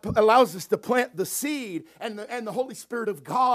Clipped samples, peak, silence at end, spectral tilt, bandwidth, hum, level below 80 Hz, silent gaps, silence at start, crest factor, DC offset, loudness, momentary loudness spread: under 0.1%; -6 dBFS; 0 s; -4 dB/octave; 16 kHz; none; -56 dBFS; none; 0.05 s; 20 dB; under 0.1%; -25 LUFS; 15 LU